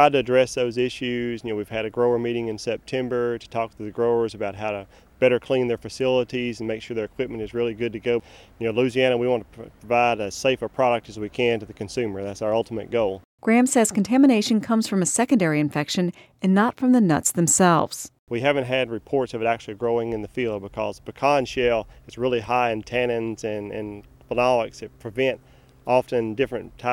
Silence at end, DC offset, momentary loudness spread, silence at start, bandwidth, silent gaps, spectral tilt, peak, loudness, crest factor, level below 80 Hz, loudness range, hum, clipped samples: 0 s; under 0.1%; 11 LU; 0 s; 16.5 kHz; 13.25-13.38 s, 18.19-18.27 s; -4.5 dB/octave; -2 dBFS; -23 LUFS; 20 dB; -54 dBFS; 5 LU; none; under 0.1%